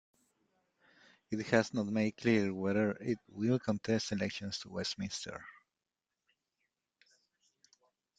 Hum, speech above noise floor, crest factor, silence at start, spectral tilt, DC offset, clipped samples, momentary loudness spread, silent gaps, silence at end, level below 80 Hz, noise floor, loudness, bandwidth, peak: none; over 56 dB; 24 dB; 1.3 s; -5.5 dB/octave; under 0.1%; under 0.1%; 10 LU; none; 2.65 s; -72 dBFS; under -90 dBFS; -35 LUFS; 9.2 kHz; -14 dBFS